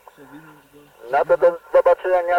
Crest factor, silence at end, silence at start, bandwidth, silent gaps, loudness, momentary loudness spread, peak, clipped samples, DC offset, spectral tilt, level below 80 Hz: 14 dB; 0 s; 0.35 s; 5.6 kHz; none; -18 LUFS; 6 LU; -4 dBFS; under 0.1%; under 0.1%; -5.5 dB/octave; -56 dBFS